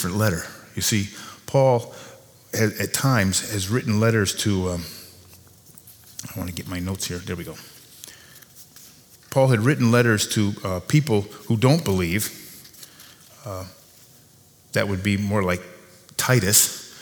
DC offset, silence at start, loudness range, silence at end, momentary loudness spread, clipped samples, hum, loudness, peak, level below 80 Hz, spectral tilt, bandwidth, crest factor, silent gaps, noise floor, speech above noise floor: under 0.1%; 0 s; 12 LU; 0 s; 22 LU; under 0.1%; none; -22 LUFS; -2 dBFS; -54 dBFS; -4.5 dB/octave; over 20 kHz; 22 dB; none; -53 dBFS; 32 dB